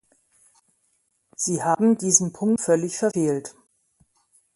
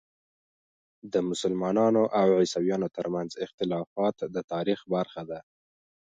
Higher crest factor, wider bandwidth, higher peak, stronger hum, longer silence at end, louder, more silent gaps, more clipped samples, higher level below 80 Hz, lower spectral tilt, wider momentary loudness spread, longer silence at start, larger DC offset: first, 24 dB vs 18 dB; first, 11.5 kHz vs 9.2 kHz; first, -2 dBFS vs -12 dBFS; neither; first, 1.05 s vs 0.75 s; first, -22 LUFS vs -28 LUFS; second, none vs 3.54-3.58 s, 3.87-3.96 s, 4.44-4.48 s; neither; about the same, -68 dBFS vs -68 dBFS; second, -4.5 dB/octave vs -6 dB/octave; about the same, 11 LU vs 12 LU; first, 1.4 s vs 1.05 s; neither